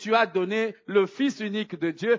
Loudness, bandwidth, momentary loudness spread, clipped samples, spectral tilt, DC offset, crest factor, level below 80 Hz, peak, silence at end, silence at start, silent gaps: -26 LUFS; 7.6 kHz; 7 LU; under 0.1%; -5.5 dB/octave; under 0.1%; 18 dB; -80 dBFS; -6 dBFS; 0 s; 0 s; none